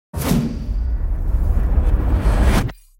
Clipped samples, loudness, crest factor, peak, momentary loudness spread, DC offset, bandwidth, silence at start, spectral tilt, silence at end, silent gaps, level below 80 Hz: under 0.1%; -20 LUFS; 14 dB; -4 dBFS; 7 LU; under 0.1%; 16.5 kHz; 0.15 s; -6.5 dB/octave; 0.25 s; none; -18 dBFS